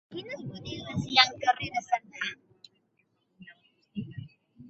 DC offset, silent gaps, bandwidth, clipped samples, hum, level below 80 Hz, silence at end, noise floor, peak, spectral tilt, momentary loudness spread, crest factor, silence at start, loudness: under 0.1%; none; 8 kHz; under 0.1%; none; -62 dBFS; 0 s; -73 dBFS; -4 dBFS; -1 dB/octave; 21 LU; 28 dB; 0.1 s; -28 LUFS